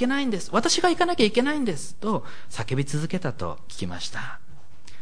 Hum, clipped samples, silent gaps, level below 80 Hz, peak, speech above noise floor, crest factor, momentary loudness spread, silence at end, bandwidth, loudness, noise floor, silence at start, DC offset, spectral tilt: none; under 0.1%; none; -52 dBFS; -6 dBFS; 24 dB; 20 dB; 14 LU; 0 s; 10.5 kHz; -25 LUFS; -49 dBFS; 0 s; 4%; -4.5 dB/octave